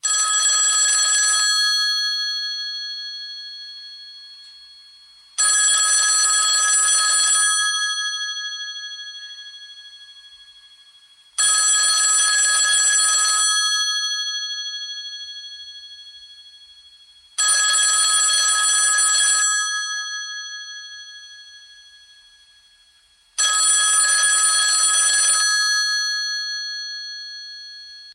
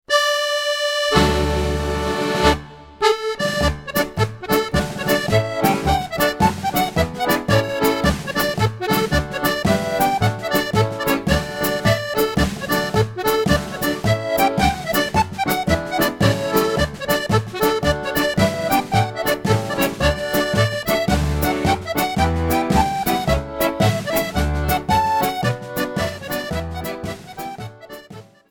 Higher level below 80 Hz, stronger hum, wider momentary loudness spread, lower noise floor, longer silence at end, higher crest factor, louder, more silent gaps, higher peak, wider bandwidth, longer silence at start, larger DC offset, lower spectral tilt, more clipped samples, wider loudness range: second, -74 dBFS vs -32 dBFS; neither; first, 20 LU vs 5 LU; first, -56 dBFS vs -41 dBFS; second, 0 s vs 0.3 s; about the same, 16 dB vs 18 dB; first, -16 LUFS vs -19 LUFS; neither; second, -6 dBFS vs 0 dBFS; second, 16 kHz vs 18 kHz; about the same, 0.05 s vs 0.1 s; neither; second, 8 dB/octave vs -5 dB/octave; neither; first, 12 LU vs 1 LU